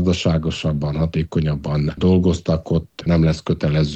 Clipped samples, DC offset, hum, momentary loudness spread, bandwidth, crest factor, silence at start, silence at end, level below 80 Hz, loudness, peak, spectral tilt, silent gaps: under 0.1%; under 0.1%; none; 5 LU; 8.4 kHz; 14 dB; 0 s; 0 s; -34 dBFS; -19 LUFS; -6 dBFS; -7.5 dB/octave; none